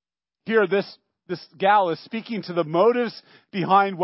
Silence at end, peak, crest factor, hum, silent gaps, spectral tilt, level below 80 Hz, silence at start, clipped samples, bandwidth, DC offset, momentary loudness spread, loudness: 0 s; -6 dBFS; 18 dB; none; none; -10 dB/octave; -80 dBFS; 0.45 s; under 0.1%; 5.8 kHz; under 0.1%; 15 LU; -22 LUFS